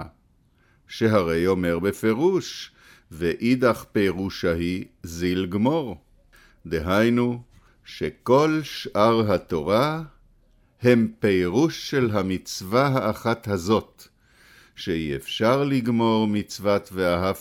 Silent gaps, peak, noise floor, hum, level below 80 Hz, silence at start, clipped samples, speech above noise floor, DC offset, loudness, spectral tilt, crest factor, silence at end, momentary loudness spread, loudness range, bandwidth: none; -4 dBFS; -61 dBFS; none; -50 dBFS; 0 s; under 0.1%; 39 dB; under 0.1%; -23 LUFS; -6 dB/octave; 18 dB; 0 s; 12 LU; 3 LU; 17 kHz